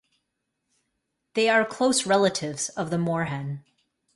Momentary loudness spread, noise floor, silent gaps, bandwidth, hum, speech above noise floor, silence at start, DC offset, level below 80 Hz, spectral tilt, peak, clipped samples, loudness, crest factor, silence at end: 12 LU; -79 dBFS; none; 11.5 kHz; none; 55 dB; 1.35 s; under 0.1%; -66 dBFS; -4 dB/octave; -8 dBFS; under 0.1%; -24 LUFS; 18 dB; 0.55 s